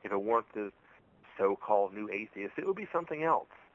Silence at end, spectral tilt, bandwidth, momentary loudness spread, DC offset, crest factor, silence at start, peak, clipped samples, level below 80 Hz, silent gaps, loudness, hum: 0.2 s; -8 dB/octave; 7.2 kHz; 11 LU; under 0.1%; 20 dB; 0.05 s; -14 dBFS; under 0.1%; -76 dBFS; none; -33 LUFS; none